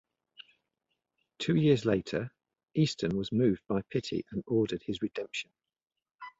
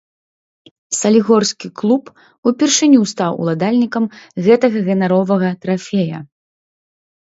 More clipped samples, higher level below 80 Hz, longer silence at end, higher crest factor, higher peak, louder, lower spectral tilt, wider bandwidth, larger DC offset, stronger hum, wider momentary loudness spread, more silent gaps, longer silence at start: neither; about the same, -62 dBFS vs -64 dBFS; second, 0.1 s vs 1.15 s; about the same, 20 dB vs 16 dB; second, -12 dBFS vs 0 dBFS; second, -31 LUFS vs -15 LUFS; first, -6.5 dB/octave vs -5 dB/octave; about the same, 8 kHz vs 8 kHz; neither; neither; first, 12 LU vs 9 LU; second, none vs 2.38-2.43 s; first, 1.4 s vs 0.9 s